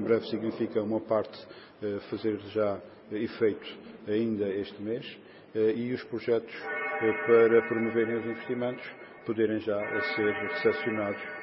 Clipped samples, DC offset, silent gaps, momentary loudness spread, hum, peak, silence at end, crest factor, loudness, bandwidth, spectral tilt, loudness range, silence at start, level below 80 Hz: under 0.1%; under 0.1%; none; 13 LU; none; -10 dBFS; 0 s; 20 dB; -30 LUFS; 5.8 kHz; -10 dB/octave; 5 LU; 0 s; -72 dBFS